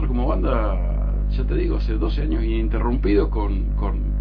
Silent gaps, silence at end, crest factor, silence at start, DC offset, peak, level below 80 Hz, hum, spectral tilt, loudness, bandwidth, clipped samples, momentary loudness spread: none; 0 s; 12 dB; 0 s; under 0.1%; -6 dBFS; -20 dBFS; 50 Hz at -20 dBFS; -10.5 dB/octave; -23 LUFS; 5 kHz; under 0.1%; 4 LU